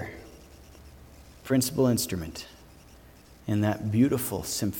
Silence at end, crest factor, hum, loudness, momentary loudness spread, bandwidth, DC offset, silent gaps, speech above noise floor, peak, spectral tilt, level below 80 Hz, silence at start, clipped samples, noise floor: 0 s; 18 dB; none; -27 LUFS; 22 LU; 19 kHz; under 0.1%; none; 26 dB; -12 dBFS; -5.5 dB/octave; -52 dBFS; 0 s; under 0.1%; -52 dBFS